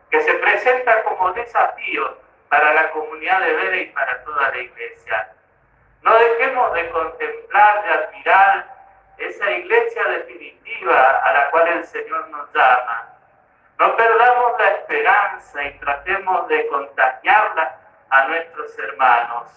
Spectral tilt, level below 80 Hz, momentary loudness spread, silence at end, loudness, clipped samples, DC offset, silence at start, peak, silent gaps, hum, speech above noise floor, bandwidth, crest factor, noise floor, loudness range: -4 dB/octave; -60 dBFS; 13 LU; 0.15 s; -17 LUFS; under 0.1%; under 0.1%; 0.1 s; 0 dBFS; none; none; 39 dB; 7.4 kHz; 18 dB; -56 dBFS; 3 LU